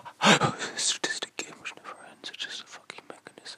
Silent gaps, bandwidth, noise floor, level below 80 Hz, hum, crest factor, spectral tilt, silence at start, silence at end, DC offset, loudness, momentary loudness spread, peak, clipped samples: none; 15.5 kHz; -48 dBFS; -72 dBFS; none; 26 dB; -2.5 dB/octave; 0.05 s; 0 s; under 0.1%; -27 LUFS; 23 LU; -4 dBFS; under 0.1%